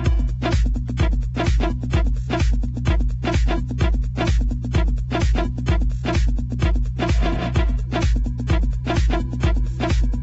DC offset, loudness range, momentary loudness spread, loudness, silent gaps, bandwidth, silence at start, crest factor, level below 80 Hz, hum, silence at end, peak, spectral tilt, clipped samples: under 0.1%; 0 LU; 2 LU; -22 LUFS; none; 8 kHz; 0 s; 12 dB; -20 dBFS; none; 0 s; -6 dBFS; -6.5 dB/octave; under 0.1%